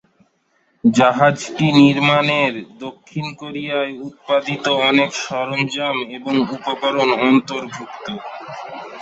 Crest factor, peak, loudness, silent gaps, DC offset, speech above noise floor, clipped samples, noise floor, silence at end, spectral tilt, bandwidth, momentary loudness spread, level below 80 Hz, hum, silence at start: 18 dB; -2 dBFS; -17 LUFS; none; under 0.1%; 45 dB; under 0.1%; -63 dBFS; 0 s; -5 dB/octave; 8 kHz; 17 LU; -60 dBFS; none; 0.85 s